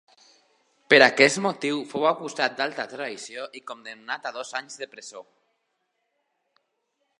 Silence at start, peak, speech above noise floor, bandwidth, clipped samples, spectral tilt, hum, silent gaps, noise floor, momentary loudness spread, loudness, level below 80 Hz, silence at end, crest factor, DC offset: 0.9 s; 0 dBFS; 51 dB; 11.5 kHz; under 0.1%; -3 dB/octave; none; none; -76 dBFS; 22 LU; -23 LUFS; -76 dBFS; 1.95 s; 26 dB; under 0.1%